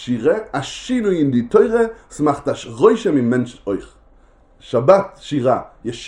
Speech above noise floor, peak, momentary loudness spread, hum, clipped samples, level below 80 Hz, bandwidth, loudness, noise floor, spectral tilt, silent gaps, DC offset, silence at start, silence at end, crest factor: 33 dB; 0 dBFS; 11 LU; none; under 0.1%; -48 dBFS; 11 kHz; -18 LUFS; -50 dBFS; -6.5 dB/octave; none; under 0.1%; 0 s; 0 s; 18 dB